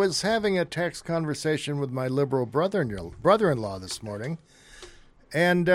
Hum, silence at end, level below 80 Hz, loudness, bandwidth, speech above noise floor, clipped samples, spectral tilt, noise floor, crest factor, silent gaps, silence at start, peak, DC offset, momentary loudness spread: none; 0 s; -54 dBFS; -26 LUFS; 16 kHz; 24 dB; under 0.1%; -5.5 dB/octave; -49 dBFS; 20 dB; none; 0 s; -6 dBFS; under 0.1%; 12 LU